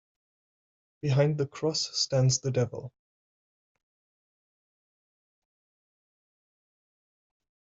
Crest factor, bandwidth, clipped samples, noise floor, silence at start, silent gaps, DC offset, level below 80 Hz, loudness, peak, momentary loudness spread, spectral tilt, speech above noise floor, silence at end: 20 dB; 7.8 kHz; under 0.1%; under -90 dBFS; 1.05 s; none; under 0.1%; -68 dBFS; -28 LUFS; -12 dBFS; 10 LU; -5 dB/octave; over 63 dB; 4.75 s